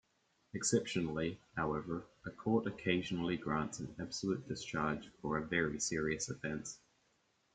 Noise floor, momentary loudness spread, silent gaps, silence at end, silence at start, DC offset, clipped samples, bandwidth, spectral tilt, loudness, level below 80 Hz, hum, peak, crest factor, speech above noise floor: -77 dBFS; 10 LU; none; 0.8 s; 0.55 s; under 0.1%; under 0.1%; 9.4 kHz; -4.5 dB/octave; -38 LUFS; -64 dBFS; none; -18 dBFS; 20 dB; 39 dB